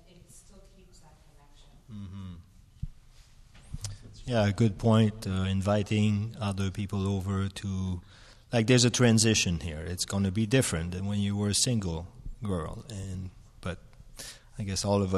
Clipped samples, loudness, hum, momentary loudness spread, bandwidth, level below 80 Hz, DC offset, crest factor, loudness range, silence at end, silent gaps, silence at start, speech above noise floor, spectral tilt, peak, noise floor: under 0.1%; -28 LUFS; none; 21 LU; 13.5 kHz; -50 dBFS; under 0.1%; 20 dB; 19 LU; 0 s; none; 0.35 s; 28 dB; -5 dB/octave; -10 dBFS; -55 dBFS